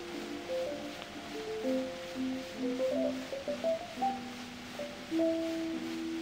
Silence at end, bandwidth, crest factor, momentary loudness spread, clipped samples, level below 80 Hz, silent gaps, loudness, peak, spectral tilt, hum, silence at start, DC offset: 0 s; 16 kHz; 14 dB; 10 LU; under 0.1%; -64 dBFS; none; -36 LUFS; -22 dBFS; -4.5 dB/octave; none; 0 s; under 0.1%